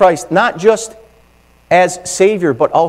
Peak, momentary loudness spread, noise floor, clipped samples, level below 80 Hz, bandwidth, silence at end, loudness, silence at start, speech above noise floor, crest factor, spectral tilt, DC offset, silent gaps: 0 dBFS; 5 LU; -48 dBFS; 0.3%; -50 dBFS; 15.5 kHz; 0 s; -13 LUFS; 0 s; 37 dB; 14 dB; -4.5 dB/octave; under 0.1%; none